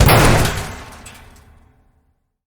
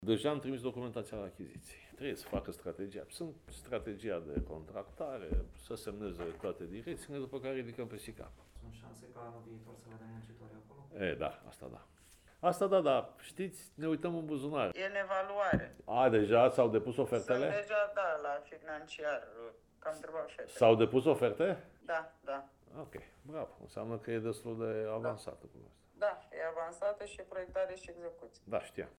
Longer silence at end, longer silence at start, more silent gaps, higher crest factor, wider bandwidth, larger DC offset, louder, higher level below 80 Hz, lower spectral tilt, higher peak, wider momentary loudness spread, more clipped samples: first, 1.55 s vs 0.05 s; about the same, 0 s vs 0 s; neither; second, 18 dB vs 24 dB; about the same, over 20 kHz vs 18.5 kHz; neither; first, -14 LUFS vs -36 LUFS; first, -26 dBFS vs -56 dBFS; second, -4.5 dB/octave vs -6 dB/octave; first, 0 dBFS vs -12 dBFS; first, 27 LU vs 22 LU; neither